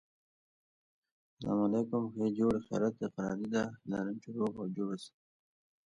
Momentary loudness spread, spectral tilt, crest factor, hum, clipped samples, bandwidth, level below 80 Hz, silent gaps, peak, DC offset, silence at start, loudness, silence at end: 8 LU; -7.5 dB/octave; 18 dB; none; under 0.1%; 10.5 kHz; -68 dBFS; none; -20 dBFS; under 0.1%; 1.4 s; -35 LUFS; 0.75 s